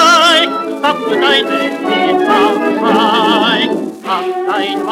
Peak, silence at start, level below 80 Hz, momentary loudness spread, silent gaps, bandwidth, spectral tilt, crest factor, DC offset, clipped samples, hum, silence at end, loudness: 0 dBFS; 0 s; -64 dBFS; 7 LU; none; 17 kHz; -3 dB/octave; 12 dB; under 0.1%; under 0.1%; none; 0 s; -12 LUFS